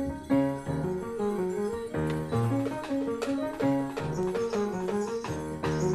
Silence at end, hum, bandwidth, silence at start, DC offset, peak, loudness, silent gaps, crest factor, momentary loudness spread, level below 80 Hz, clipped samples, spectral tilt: 0 s; none; 14.5 kHz; 0 s; under 0.1%; -16 dBFS; -30 LUFS; none; 14 dB; 4 LU; -54 dBFS; under 0.1%; -7 dB/octave